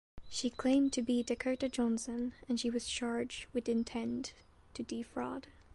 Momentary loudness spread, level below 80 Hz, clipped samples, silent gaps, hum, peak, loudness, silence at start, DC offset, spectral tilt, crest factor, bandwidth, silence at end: 11 LU; -62 dBFS; under 0.1%; none; none; -20 dBFS; -36 LUFS; 0.15 s; under 0.1%; -3.5 dB/octave; 16 dB; 11.5 kHz; 0.15 s